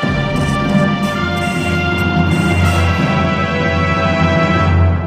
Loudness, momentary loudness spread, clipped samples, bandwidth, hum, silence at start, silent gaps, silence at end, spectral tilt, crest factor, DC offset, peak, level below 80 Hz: -14 LUFS; 4 LU; under 0.1%; 15 kHz; none; 0 s; none; 0 s; -6.5 dB/octave; 12 dB; under 0.1%; 0 dBFS; -28 dBFS